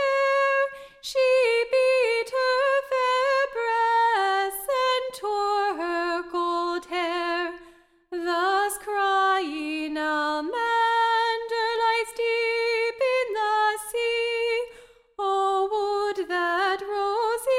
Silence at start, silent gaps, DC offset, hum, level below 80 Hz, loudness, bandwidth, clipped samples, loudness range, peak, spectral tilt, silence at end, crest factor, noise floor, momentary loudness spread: 0 s; none; under 0.1%; none; -62 dBFS; -24 LUFS; 16 kHz; under 0.1%; 4 LU; -12 dBFS; -1 dB/octave; 0 s; 12 dB; -54 dBFS; 7 LU